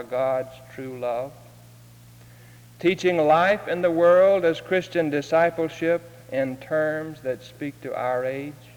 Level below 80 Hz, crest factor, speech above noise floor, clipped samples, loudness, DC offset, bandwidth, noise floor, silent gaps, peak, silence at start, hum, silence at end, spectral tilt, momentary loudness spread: -62 dBFS; 16 dB; 25 dB; under 0.1%; -23 LUFS; under 0.1%; over 20 kHz; -48 dBFS; none; -8 dBFS; 0 s; none; 0.2 s; -6 dB/octave; 14 LU